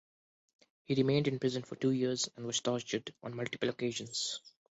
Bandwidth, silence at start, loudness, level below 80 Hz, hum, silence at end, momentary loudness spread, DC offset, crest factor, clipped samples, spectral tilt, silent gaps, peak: 8.2 kHz; 0.9 s; -35 LUFS; -72 dBFS; none; 0.2 s; 9 LU; under 0.1%; 18 dB; under 0.1%; -4.5 dB/octave; none; -18 dBFS